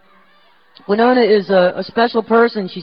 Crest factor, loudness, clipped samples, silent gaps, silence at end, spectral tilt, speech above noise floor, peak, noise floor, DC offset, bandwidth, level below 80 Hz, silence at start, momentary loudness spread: 14 dB; -14 LUFS; under 0.1%; none; 0 s; -8.5 dB/octave; 39 dB; -2 dBFS; -53 dBFS; 0.2%; 5.4 kHz; -62 dBFS; 0.9 s; 5 LU